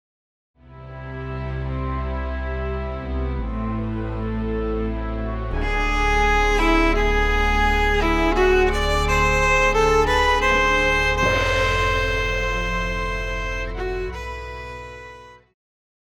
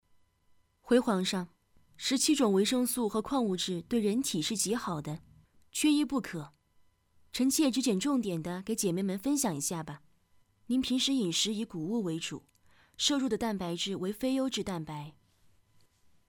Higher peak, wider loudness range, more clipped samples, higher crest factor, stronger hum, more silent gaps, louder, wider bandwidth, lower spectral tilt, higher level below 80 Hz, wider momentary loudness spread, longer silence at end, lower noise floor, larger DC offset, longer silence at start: first, -6 dBFS vs -12 dBFS; first, 10 LU vs 4 LU; neither; about the same, 16 dB vs 20 dB; neither; neither; first, -21 LUFS vs -31 LUFS; second, 14.5 kHz vs over 20 kHz; about the same, -5 dB/octave vs -4 dB/octave; first, -26 dBFS vs -64 dBFS; about the same, 13 LU vs 13 LU; second, 0.7 s vs 1.2 s; second, -42 dBFS vs -68 dBFS; neither; second, 0.7 s vs 0.85 s